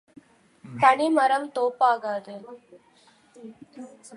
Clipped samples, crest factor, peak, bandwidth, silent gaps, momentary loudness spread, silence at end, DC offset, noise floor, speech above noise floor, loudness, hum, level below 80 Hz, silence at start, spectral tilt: under 0.1%; 20 dB; -6 dBFS; 11 kHz; none; 24 LU; 0 s; under 0.1%; -59 dBFS; 35 dB; -22 LUFS; none; -78 dBFS; 0.65 s; -5 dB/octave